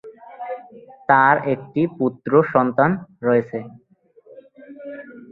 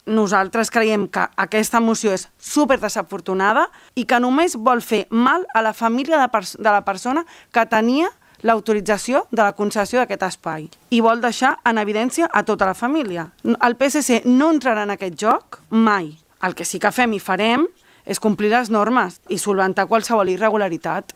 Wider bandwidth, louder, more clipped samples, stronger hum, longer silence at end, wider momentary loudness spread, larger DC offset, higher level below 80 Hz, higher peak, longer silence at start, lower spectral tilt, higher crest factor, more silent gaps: second, 4.5 kHz vs 16 kHz; about the same, -18 LUFS vs -19 LUFS; neither; neither; about the same, 0.05 s vs 0.15 s; first, 21 LU vs 7 LU; neither; second, -64 dBFS vs -58 dBFS; about the same, 0 dBFS vs 0 dBFS; about the same, 0.05 s vs 0.05 s; first, -10.5 dB/octave vs -4 dB/octave; about the same, 20 dB vs 18 dB; neither